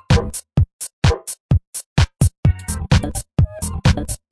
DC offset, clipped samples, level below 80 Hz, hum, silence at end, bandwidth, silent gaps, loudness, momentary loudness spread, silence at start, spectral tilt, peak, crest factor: under 0.1%; under 0.1%; -26 dBFS; none; 0.15 s; 11 kHz; 0.73-0.79 s, 0.93-1.02 s, 1.40-1.49 s, 1.67-1.73 s, 1.86-1.96 s, 2.38-2.43 s; -20 LUFS; 5 LU; 0.1 s; -5.5 dB/octave; 0 dBFS; 18 dB